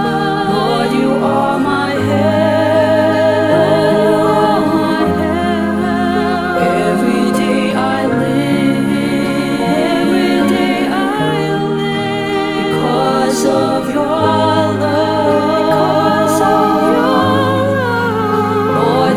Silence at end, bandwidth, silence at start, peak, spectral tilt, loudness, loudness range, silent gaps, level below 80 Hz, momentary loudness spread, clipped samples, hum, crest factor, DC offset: 0 s; 18.5 kHz; 0 s; -2 dBFS; -6 dB/octave; -13 LUFS; 2 LU; none; -46 dBFS; 4 LU; under 0.1%; none; 12 dB; 0.3%